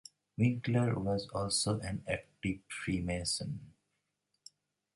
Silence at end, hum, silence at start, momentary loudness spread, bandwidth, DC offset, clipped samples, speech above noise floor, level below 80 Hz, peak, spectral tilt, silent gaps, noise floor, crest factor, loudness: 1.25 s; 50 Hz at -55 dBFS; 0.4 s; 8 LU; 11.5 kHz; under 0.1%; under 0.1%; 49 dB; -56 dBFS; -16 dBFS; -5 dB/octave; none; -83 dBFS; 20 dB; -35 LUFS